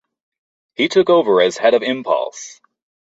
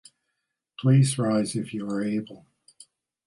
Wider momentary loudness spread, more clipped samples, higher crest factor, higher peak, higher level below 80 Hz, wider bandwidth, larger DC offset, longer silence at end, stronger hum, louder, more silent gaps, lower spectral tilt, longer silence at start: first, 21 LU vs 11 LU; neither; about the same, 16 dB vs 18 dB; first, -2 dBFS vs -8 dBFS; about the same, -64 dBFS vs -68 dBFS; second, 8 kHz vs 11.5 kHz; neither; second, 0.55 s vs 0.9 s; neither; first, -16 LUFS vs -25 LUFS; neither; second, -4 dB/octave vs -6.5 dB/octave; about the same, 0.8 s vs 0.8 s